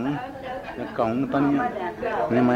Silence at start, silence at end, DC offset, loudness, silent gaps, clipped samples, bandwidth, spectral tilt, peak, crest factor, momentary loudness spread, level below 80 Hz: 0 s; 0 s; under 0.1%; -26 LUFS; none; under 0.1%; 8.2 kHz; -8 dB/octave; -8 dBFS; 16 dB; 11 LU; -54 dBFS